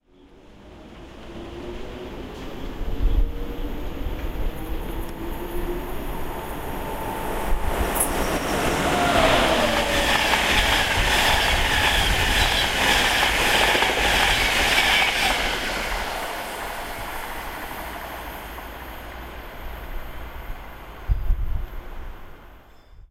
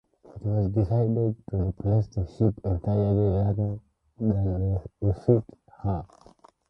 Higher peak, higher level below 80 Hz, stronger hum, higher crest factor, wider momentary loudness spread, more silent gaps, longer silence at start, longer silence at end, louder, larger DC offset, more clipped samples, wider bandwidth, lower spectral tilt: about the same, -4 dBFS vs -6 dBFS; first, -30 dBFS vs -40 dBFS; neither; about the same, 18 dB vs 20 dB; first, 19 LU vs 8 LU; neither; first, 0.5 s vs 0.35 s; second, 0.05 s vs 0.65 s; first, -22 LUFS vs -27 LUFS; neither; neither; first, 16 kHz vs 5.8 kHz; second, -3 dB/octave vs -12 dB/octave